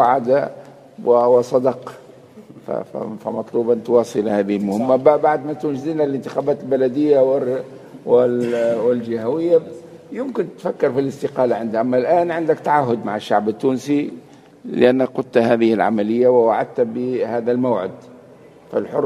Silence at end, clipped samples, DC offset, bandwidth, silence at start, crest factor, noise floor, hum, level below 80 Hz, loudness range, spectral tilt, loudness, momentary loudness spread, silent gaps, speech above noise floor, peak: 0 s; under 0.1%; under 0.1%; 12 kHz; 0 s; 18 dB; -44 dBFS; none; -66 dBFS; 3 LU; -7 dB/octave; -18 LUFS; 12 LU; none; 27 dB; 0 dBFS